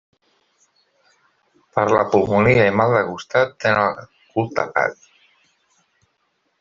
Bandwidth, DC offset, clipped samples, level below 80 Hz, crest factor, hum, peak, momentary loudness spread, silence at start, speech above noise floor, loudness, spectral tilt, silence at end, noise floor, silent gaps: 7.4 kHz; under 0.1%; under 0.1%; -54 dBFS; 18 dB; none; -2 dBFS; 10 LU; 1.75 s; 51 dB; -18 LUFS; -6.5 dB/octave; 1.65 s; -69 dBFS; none